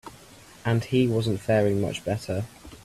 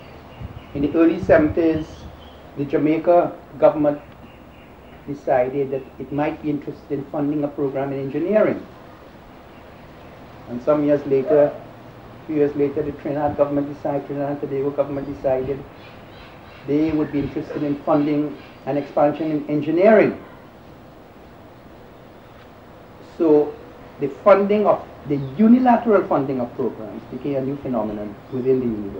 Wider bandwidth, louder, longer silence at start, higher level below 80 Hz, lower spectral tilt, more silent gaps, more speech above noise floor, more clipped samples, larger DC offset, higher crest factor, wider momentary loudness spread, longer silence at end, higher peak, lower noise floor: second, 14 kHz vs 16 kHz; second, -26 LUFS vs -20 LUFS; about the same, 0.05 s vs 0 s; second, -54 dBFS vs -48 dBFS; second, -6.5 dB/octave vs -9 dB/octave; neither; about the same, 25 dB vs 24 dB; neither; neither; about the same, 16 dB vs 20 dB; second, 10 LU vs 22 LU; about the same, 0.1 s vs 0 s; second, -10 dBFS vs -2 dBFS; first, -49 dBFS vs -43 dBFS